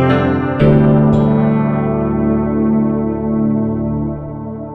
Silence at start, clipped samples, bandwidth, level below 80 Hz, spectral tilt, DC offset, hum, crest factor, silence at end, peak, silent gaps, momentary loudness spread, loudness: 0 s; under 0.1%; 4.4 kHz; -32 dBFS; -10.5 dB/octave; under 0.1%; none; 12 dB; 0 s; -2 dBFS; none; 9 LU; -14 LUFS